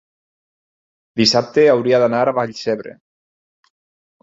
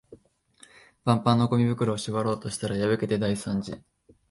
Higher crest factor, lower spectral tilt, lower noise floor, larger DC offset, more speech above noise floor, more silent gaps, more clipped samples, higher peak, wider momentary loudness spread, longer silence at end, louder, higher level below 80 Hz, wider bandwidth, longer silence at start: about the same, 18 dB vs 20 dB; second, -4.5 dB/octave vs -6.5 dB/octave; first, under -90 dBFS vs -58 dBFS; neither; first, over 75 dB vs 32 dB; neither; neither; first, -2 dBFS vs -8 dBFS; about the same, 12 LU vs 10 LU; first, 1.3 s vs 0.5 s; first, -16 LUFS vs -26 LUFS; about the same, -60 dBFS vs -56 dBFS; second, 7.8 kHz vs 11.5 kHz; first, 1.15 s vs 0.1 s